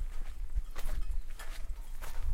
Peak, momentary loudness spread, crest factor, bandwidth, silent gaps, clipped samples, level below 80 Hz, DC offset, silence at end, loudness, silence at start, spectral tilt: -20 dBFS; 5 LU; 10 dB; 15.5 kHz; none; under 0.1%; -36 dBFS; under 0.1%; 0 s; -44 LUFS; 0 s; -4 dB/octave